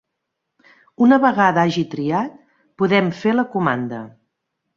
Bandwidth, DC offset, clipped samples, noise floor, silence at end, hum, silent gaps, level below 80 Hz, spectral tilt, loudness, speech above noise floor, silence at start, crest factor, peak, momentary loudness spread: 7.2 kHz; under 0.1%; under 0.1%; -78 dBFS; 0.7 s; none; none; -62 dBFS; -7 dB/octave; -18 LUFS; 60 dB; 1 s; 18 dB; -2 dBFS; 11 LU